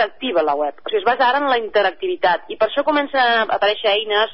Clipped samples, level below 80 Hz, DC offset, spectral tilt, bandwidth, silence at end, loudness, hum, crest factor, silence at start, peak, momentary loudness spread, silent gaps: under 0.1%; -62 dBFS; 0.8%; -7.5 dB/octave; 5.8 kHz; 0 s; -18 LUFS; none; 12 dB; 0 s; -6 dBFS; 4 LU; none